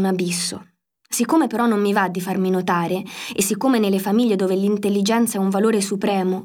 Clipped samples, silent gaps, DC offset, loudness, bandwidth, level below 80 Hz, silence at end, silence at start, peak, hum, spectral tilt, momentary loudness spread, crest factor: under 0.1%; none; under 0.1%; -20 LUFS; 18.5 kHz; -68 dBFS; 0 s; 0 s; -6 dBFS; none; -5 dB/octave; 6 LU; 14 dB